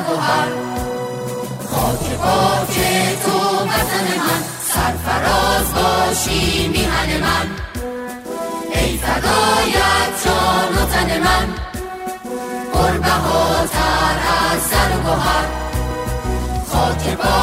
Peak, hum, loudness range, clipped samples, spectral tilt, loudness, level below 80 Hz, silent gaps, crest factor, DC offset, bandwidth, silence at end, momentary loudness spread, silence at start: -2 dBFS; none; 2 LU; under 0.1%; -4 dB/octave; -17 LUFS; -28 dBFS; none; 16 dB; under 0.1%; 16.5 kHz; 0 s; 10 LU; 0 s